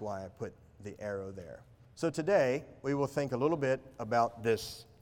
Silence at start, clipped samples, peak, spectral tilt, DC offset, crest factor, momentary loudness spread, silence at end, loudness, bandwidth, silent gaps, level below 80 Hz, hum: 0 s; under 0.1%; -16 dBFS; -6 dB/octave; under 0.1%; 18 dB; 18 LU; 0.2 s; -33 LUFS; 17.5 kHz; none; -66 dBFS; none